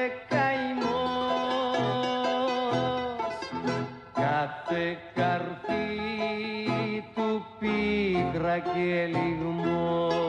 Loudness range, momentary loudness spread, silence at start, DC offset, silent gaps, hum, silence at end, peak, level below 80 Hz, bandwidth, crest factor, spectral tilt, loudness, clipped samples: 2 LU; 5 LU; 0 s; under 0.1%; none; none; 0 s; -14 dBFS; -56 dBFS; 10 kHz; 14 dB; -6.5 dB/octave; -29 LUFS; under 0.1%